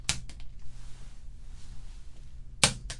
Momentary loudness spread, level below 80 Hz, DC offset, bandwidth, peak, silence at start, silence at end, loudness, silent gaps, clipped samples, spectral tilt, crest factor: 26 LU; -44 dBFS; under 0.1%; 11.5 kHz; 0 dBFS; 0 s; 0 s; -28 LUFS; none; under 0.1%; -1.5 dB/octave; 34 dB